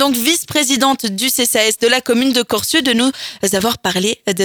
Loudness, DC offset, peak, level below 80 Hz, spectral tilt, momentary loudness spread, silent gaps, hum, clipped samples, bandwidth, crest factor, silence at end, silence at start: -14 LUFS; under 0.1%; 0 dBFS; -52 dBFS; -2 dB/octave; 4 LU; none; none; under 0.1%; over 20 kHz; 16 dB; 0 s; 0 s